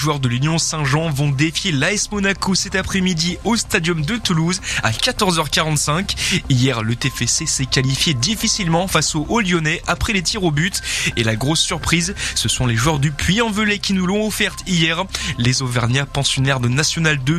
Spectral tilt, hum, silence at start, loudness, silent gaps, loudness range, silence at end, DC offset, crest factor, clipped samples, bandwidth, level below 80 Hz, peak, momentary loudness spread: -3.5 dB/octave; none; 0 s; -17 LUFS; none; 1 LU; 0 s; under 0.1%; 18 dB; under 0.1%; 14.5 kHz; -36 dBFS; 0 dBFS; 3 LU